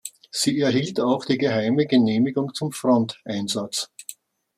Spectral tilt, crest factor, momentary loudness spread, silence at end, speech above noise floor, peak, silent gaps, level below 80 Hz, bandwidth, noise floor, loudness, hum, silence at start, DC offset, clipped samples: -5 dB/octave; 16 dB; 10 LU; 0.45 s; 22 dB; -6 dBFS; none; -66 dBFS; 14.5 kHz; -44 dBFS; -22 LUFS; none; 0.05 s; under 0.1%; under 0.1%